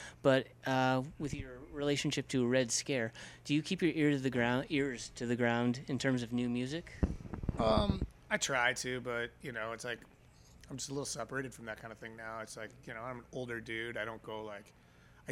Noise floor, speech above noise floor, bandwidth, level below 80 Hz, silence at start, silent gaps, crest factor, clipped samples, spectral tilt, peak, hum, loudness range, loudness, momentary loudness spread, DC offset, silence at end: -60 dBFS; 24 dB; 15.5 kHz; -52 dBFS; 0 s; none; 20 dB; under 0.1%; -4.5 dB/octave; -16 dBFS; none; 9 LU; -35 LUFS; 14 LU; under 0.1%; 0 s